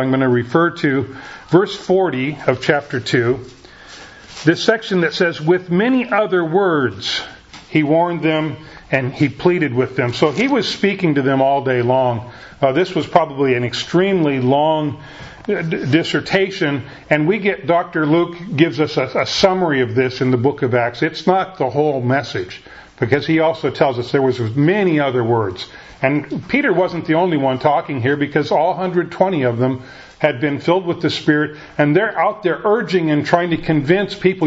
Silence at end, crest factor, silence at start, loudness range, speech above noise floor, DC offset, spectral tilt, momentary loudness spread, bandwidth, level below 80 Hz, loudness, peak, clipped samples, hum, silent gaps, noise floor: 0 s; 16 dB; 0 s; 2 LU; 22 dB; under 0.1%; -6.5 dB/octave; 6 LU; 8 kHz; -52 dBFS; -17 LUFS; 0 dBFS; under 0.1%; none; none; -39 dBFS